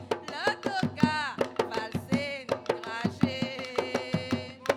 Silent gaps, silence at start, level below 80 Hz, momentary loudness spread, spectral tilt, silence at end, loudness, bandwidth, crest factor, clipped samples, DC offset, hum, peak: none; 0 s; -62 dBFS; 6 LU; -5.5 dB/octave; 0 s; -31 LUFS; 16.5 kHz; 24 dB; under 0.1%; under 0.1%; none; -8 dBFS